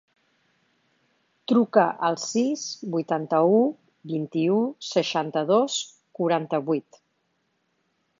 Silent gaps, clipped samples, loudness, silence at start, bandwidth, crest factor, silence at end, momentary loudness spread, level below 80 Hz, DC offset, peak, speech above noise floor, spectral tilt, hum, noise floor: none; under 0.1%; -24 LUFS; 1.5 s; 7.6 kHz; 22 dB; 1.4 s; 10 LU; -78 dBFS; under 0.1%; -4 dBFS; 49 dB; -5 dB/octave; none; -72 dBFS